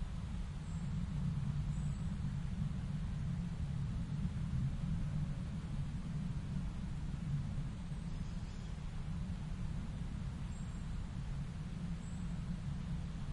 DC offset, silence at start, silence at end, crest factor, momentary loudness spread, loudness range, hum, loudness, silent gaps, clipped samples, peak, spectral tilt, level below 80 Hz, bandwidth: under 0.1%; 0 s; 0 s; 14 dB; 5 LU; 4 LU; none; -42 LUFS; none; under 0.1%; -26 dBFS; -7.5 dB/octave; -44 dBFS; 11 kHz